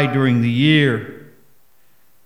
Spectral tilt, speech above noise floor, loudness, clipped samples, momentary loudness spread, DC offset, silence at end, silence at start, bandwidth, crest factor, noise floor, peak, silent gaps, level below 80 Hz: -7.5 dB/octave; 44 dB; -16 LUFS; under 0.1%; 12 LU; 0.4%; 1.05 s; 0 s; 14 kHz; 16 dB; -59 dBFS; -2 dBFS; none; -66 dBFS